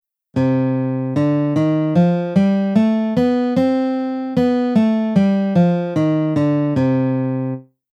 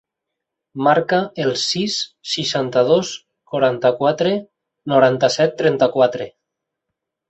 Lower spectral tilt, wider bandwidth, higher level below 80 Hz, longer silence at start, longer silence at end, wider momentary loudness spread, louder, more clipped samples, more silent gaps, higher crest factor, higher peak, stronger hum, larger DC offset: first, -9 dB/octave vs -4.5 dB/octave; about the same, 8 kHz vs 8.2 kHz; about the same, -58 dBFS vs -62 dBFS; second, 0.35 s vs 0.75 s; second, 0.3 s vs 1 s; second, 5 LU vs 12 LU; about the same, -17 LUFS vs -18 LUFS; neither; neither; about the same, 14 dB vs 16 dB; about the same, -4 dBFS vs -2 dBFS; neither; neither